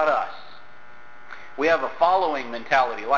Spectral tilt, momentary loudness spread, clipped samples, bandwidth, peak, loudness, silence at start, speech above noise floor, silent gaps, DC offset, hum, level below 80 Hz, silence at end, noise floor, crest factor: -4 dB/octave; 21 LU; under 0.1%; 7.2 kHz; -6 dBFS; -23 LUFS; 0 s; 27 dB; none; 1%; none; -60 dBFS; 0 s; -48 dBFS; 18 dB